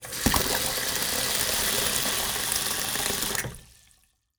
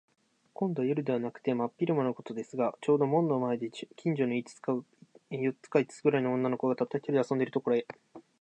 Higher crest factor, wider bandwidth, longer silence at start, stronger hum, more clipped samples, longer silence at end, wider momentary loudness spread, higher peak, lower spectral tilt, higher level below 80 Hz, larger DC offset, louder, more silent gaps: first, 26 dB vs 18 dB; first, over 20 kHz vs 9.4 kHz; second, 0 s vs 0.6 s; neither; neither; first, 0.75 s vs 0.2 s; second, 3 LU vs 8 LU; first, -2 dBFS vs -12 dBFS; second, -1.5 dB/octave vs -7.5 dB/octave; first, -44 dBFS vs -82 dBFS; neither; first, -24 LUFS vs -31 LUFS; neither